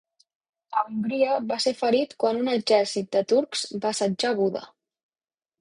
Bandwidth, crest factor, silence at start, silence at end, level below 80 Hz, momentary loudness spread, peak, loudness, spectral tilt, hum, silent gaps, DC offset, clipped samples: 11 kHz; 18 dB; 0.7 s; 0.95 s; -70 dBFS; 6 LU; -8 dBFS; -25 LUFS; -4 dB/octave; none; none; under 0.1%; under 0.1%